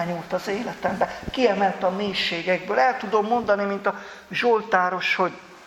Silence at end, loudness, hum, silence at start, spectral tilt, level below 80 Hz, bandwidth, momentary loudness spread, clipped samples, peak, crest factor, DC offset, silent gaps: 0 s; -23 LUFS; none; 0 s; -5 dB/octave; -54 dBFS; 16.5 kHz; 7 LU; under 0.1%; -4 dBFS; 20 dB; under 0.1%; none